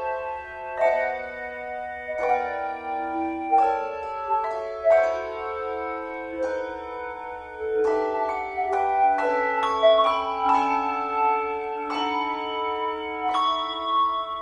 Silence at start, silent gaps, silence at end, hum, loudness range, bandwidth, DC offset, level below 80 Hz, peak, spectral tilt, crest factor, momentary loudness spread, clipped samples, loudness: 0 s; none; 0 s; none; 5 LU; 10 kHz; under 0.1%; -56 dBFS; -8 dBFS; -4 dB/octave; 18 dB; 12 LU; under 0.1%; -25 LUFS